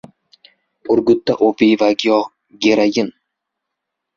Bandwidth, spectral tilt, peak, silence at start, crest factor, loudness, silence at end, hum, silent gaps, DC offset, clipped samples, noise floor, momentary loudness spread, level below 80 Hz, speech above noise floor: 7.4 kHz; -5 dB/octave; 0 dBFS; 0.85 s; 16 dB; -15 LUFS; 1.05 s; none; none; under 0.1%; under 0.1%; -79 dBFS; 10 LU; -58 dBFS; 64 dB